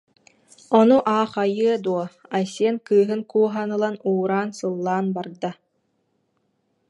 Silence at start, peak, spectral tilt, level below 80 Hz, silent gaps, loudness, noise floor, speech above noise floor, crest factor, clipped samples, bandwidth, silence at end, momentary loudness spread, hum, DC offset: 0.7 s; -4 dBFS; -6.5 dB/octave; -72 dBFS; none; -22 LUFS; -70 dBFS; 49 dB; 20 dB; under 0.1%; 11 kHz; 1.35 s; 10 LU; none; under 0.1%